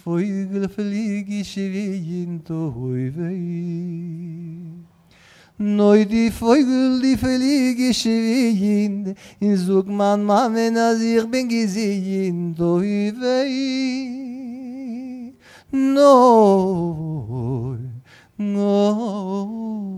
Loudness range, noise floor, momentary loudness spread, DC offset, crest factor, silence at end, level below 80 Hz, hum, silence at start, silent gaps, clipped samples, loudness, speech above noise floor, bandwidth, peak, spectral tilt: 9 LU; -51 dBFS; 16 LU; under 0.1%; 18 dB; 0 s; -52 dBFS; none; 0.05 s; none; under 0.1%; -19 LUFS; 32 dB; 14.5 kHz; -2 dBFS; -6.5 dB/octave